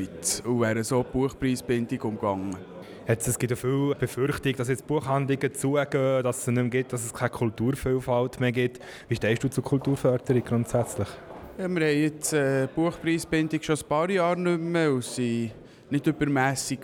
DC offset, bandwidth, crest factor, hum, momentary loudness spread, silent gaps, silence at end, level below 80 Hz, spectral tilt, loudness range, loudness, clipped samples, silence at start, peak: under 0.1%; 19.5 kHz; 16 dB; none; 7 LU; none; 0 s; -52 dBFS; -5.5 dB/octave; 2 LU; -26 LUFS; under 0.1%; 0 s; -10 dBFS